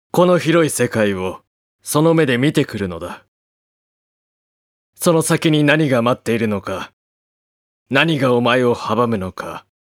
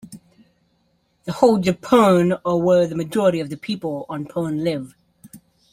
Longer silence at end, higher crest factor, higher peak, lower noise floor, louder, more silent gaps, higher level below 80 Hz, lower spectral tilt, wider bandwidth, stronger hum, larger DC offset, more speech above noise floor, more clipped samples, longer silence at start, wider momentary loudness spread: about the same, 0.35 s vs 0.35 s; about the same, 18 dB vs 20 dB; about the same, 0 dBFS vs 0 dBFS; first, under -90 dBFS vs -65 dBFS; about the same, -17 LUFS vs -19 LUFS; first, 1.47-1.79 s, 3.28-4.93 s, 6.93-7.86 s vs none; about the same, -56 dBFS vs -56 dBFS; second, -5 dB/octave vs -6.5 dB/octave; about the same, 17 kHz vs 16 kHz; neither; neither; first, over 74 dB vs 46 dB; neither; about the same, 0.15 s vs 0.05 s; first, 16 LU vs 13 LU